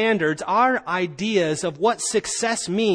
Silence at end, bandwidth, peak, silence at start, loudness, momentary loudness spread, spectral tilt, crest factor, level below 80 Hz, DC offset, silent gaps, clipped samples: 0 s; 10.5 kHz; -8 dBFS; 0 s; -22 LUFS; 4 LU; -3.5 dB/octave; 14 dB; -60 dBFS; under 0.1%; none; under 0.1%